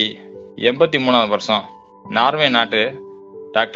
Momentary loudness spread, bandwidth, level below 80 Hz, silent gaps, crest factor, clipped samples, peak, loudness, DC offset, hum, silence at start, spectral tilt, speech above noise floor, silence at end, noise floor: 22 LU; 7.6 kHz; -62 dBFS; none; 18 dB; under 0.1%; 0 dBFS; -17 LUFS; under 0.1%; none; 0 s; -4.5 dB/octave; 20 dB; 0 s; -36 dBFS